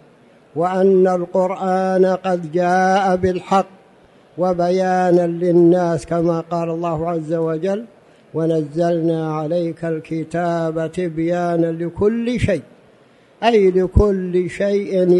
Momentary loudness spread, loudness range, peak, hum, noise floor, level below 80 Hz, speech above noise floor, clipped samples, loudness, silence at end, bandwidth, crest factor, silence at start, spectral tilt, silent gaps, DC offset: 8 LU; 4 LU; 0 dBFS; none; -50 dBFS; -36 dBFS; 33 dB; under 0.1%; -18 LUFS; 0 s; 11 kHz; 18 dB; 0.55 s; -7.5 dB/octave; none; under 0.1%